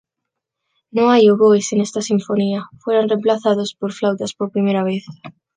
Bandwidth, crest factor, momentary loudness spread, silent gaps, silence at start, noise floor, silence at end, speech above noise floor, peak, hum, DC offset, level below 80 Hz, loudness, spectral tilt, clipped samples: 9.8 kHz; 16 dB; 12 LU; none; 0.95 s; -80 dBFS; 0.25 s; 64 dB; -2 dBFS; none; under 0.1%; -66 dBFS; -17 LUFS; -5.5 dB/octave; under 0.1%